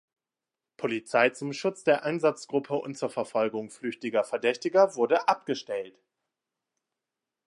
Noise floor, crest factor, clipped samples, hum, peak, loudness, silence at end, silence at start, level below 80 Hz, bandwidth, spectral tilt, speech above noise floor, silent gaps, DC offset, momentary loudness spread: -90 dBFS; 22 dB; under 0.1%; none; -8 dBFS; -28 LUFS; 1.6 s; 0.8 s; -82 dBFS; 11.5 kHz; -4.5 dB/octave; 63 dB; none; under 0.1%; 11 LU